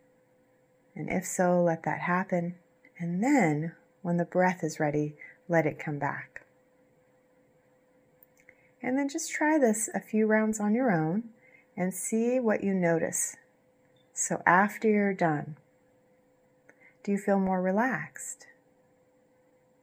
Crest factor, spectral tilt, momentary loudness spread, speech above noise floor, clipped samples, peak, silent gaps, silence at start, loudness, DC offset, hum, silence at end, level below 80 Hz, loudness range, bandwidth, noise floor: 24 dB; -6 dB/octave; 15 LU; 38 dB; under 0.1%; -6 dBFS; none; 0.95 s; -28 LUFS; under 0.1%; none; 1.5 s; -70 dBFS; 6 LU; 16 kHz; -66 dBFS